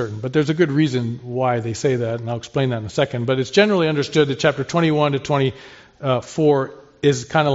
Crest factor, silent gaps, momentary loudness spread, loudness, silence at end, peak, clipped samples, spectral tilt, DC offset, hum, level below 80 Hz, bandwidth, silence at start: 18 dB; none; 7 LU; -20 LUFS; 0 s; -2 dBFS; under 0.1%; -5 dB/octave; under 0.1%; none; -56 dBFS; 8 kHz; 0 s